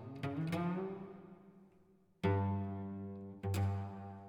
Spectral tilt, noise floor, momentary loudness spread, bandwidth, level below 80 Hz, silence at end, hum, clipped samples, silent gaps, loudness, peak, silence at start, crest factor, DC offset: -8 dB/octave; -68 dBFS; 15 LU; 16.5 kHz; -72 dBFS; 0 s; none; under 0.1%; none; -40 LUFS; -22 dBFS; 0 s; 18 dB; under 0.1%